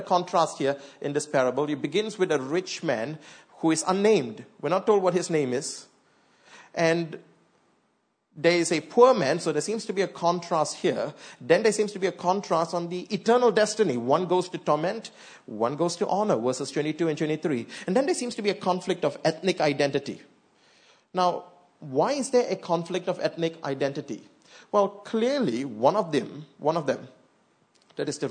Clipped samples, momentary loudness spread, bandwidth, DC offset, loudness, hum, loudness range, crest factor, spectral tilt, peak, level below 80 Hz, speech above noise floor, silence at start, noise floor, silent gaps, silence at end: under 0.1%; 12 LU; 9.6 kHz; under 0.1%; -26 LUFS; none; 4 LU; 22 dB; -4.5 dB/octave; -6 dBFS; -78 dBFS; 46 dB; 0 s; -72 dBFS; none; 0 s